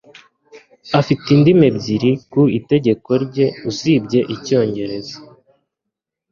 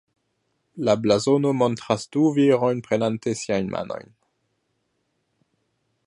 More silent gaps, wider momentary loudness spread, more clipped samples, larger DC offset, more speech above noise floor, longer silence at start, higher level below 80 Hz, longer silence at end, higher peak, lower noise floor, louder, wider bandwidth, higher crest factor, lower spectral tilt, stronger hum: neither; about the same, 11 LU vs 9 LU; neither; neither; first, 65 dB vs 52 dB; second, 0.55 s vs 0.75 s; first, -52 dBFS vs -62 dBFS; second, 1.05 s vs 2.05 s; first, 0 dBFS vs -4 dBFS; first, -81 dBFS vs -73 dBFS; first, -16 LUFS vs -22 LUFS; second, 7.4 kHz vs 11 kHz; about the same, 16 dB vs 20 dB; about the same, -7 dB/octave vs -6 dB/octave; neither